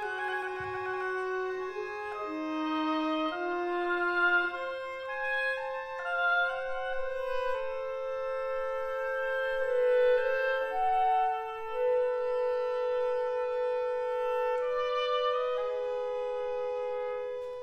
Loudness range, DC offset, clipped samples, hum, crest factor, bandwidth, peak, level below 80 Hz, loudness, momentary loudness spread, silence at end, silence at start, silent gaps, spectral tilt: 4 LU; under 0.1%; under 0.1%; none; 14 dB; 8.8 kHz; -18 dBFS; -60 dBFS; -31 LUFS; 9 LU; 0 s; 0 s; none; -4.5 dB/octave